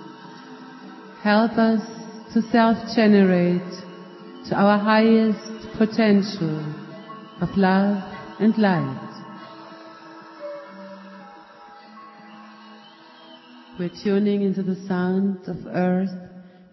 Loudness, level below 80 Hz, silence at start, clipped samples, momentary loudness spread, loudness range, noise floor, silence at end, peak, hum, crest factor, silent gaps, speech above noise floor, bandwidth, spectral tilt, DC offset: -21 LUFS; -60 dBFS; 0 s; under 0.1%; 24 LU; 20 LU; -47 dBFS; 0.3 s; -4 dBFS; none; 18 dB; none; 27 dB; 6 kHz; -7.5 dB/octave; under 0.1%